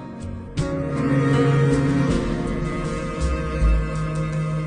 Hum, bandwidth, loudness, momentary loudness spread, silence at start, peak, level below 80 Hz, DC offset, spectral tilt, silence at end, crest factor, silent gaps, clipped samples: none; 10 kHz; -22 LUFS; 9 LU; 0 s; -8 dBFS; -28 dBFS; under 0.1%; -7.5 dB/octave; 0 s; 14 dB; none; under 0.1%